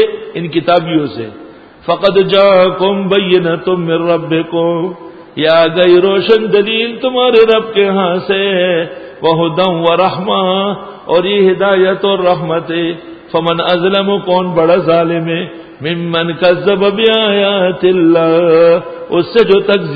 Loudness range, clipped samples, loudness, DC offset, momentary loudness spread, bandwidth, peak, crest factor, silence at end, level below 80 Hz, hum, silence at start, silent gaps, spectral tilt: 3 LU; under 0.1%; -11 LUFS; under 0.1%; 10 LU; 5 kHz; 0 dBFS; 12 dB; 0 s; -52 dBFS; none; 0 s; none; -8 dB/octave